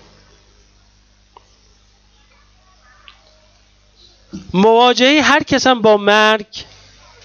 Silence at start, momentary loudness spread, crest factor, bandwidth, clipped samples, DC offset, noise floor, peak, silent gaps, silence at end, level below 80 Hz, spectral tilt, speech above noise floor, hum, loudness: 4.35 s; 21 LU; 18 dB; 8.6 kHz; under 0.1%; under 0.1%; -52 dBFS; 0 dBFS; none; 0.6 s; -52 dBFS; -4 dB/octave; 40 dB; 50 Hz at -50 dBFS; -12 LUFS